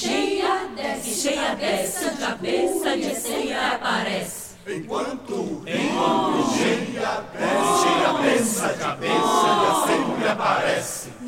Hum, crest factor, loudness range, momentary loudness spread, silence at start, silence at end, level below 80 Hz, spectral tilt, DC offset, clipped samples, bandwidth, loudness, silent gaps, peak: none; 18 dB; 5 LU; 9 LU; 0 s; 0 s; -56 dBFS; -3 dB/octave; 0.1%; under 0.1%; 17 kHz; -22 LUFS; none; -6 dBFS